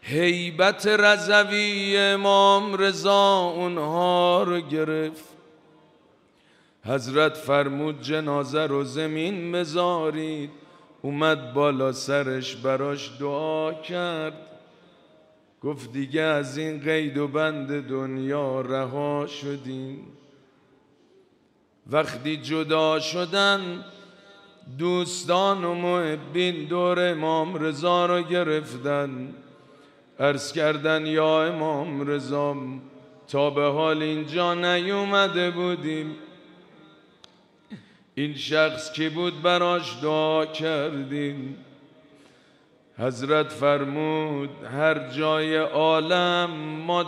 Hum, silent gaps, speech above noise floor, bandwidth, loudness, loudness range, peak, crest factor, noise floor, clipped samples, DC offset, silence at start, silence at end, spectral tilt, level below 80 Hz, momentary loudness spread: none; none; 39 dB; 14.5 kHz; -24 LUFS; 9 LU; -4 dBFS; 20 dB; -63 dBFS; under 0.1%; under 0.1%; 0.05 s; 0 s; -5 dB/octave; -74 dBFS; 12 LU